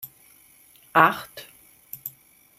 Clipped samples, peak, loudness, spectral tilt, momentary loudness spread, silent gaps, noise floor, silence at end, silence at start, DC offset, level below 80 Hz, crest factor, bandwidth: under 0.1%; 0 dBFS; -21 LUFS; -4.5 dB/octave; 23 LU; none; -55 dBFS; 0.5 s; 0.05 s; under 0.1%; -70 dBFS; 26 dB; 16 kHz